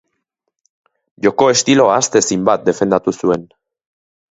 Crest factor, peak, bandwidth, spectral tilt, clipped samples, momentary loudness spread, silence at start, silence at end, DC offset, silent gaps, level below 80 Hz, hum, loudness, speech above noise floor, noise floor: 16 dB; 0 dBFS; 8.2 kHz; -3.5 dB/octave; under 0.1%; 7 LU; 1.2 s; 0.85 s; under 0.1%; none; -54 dBFS; none; -14 LUFS; 60 dB; -74 dBFS